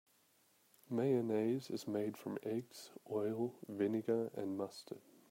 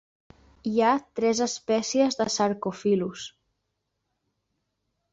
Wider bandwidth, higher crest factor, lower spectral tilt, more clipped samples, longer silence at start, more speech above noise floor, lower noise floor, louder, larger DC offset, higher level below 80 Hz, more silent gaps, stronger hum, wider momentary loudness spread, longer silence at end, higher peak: first, 16 kHz vs 8 kHz; about the same, 18 dB vs 18 dB; first, -7 dB/octave vs -4 dB/octave; neither; first, 0.9 s vs 0.65 s; second, 34 dB vs 54 dB; second, -73 dBFS vs -79 dBFS; second, -40 LUFS vs -25 LUFS; neither; second, -88 dBFS vs -66 dBFS; neither; neither; first, 15 LU vs 11 LU; second, 0.3 s vs 1.85 s; second, -22 dBFS vs -10 dBFS